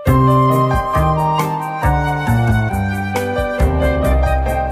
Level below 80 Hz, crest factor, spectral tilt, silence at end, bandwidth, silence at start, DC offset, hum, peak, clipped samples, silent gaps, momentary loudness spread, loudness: -22 dBFS; 14 dB; -7.5 dB/octave; 0 s; 16 kHz; 0 s; under 0.1%; none; -2 dBFS; under 0.1%; none; 7 LU; -16 LUFS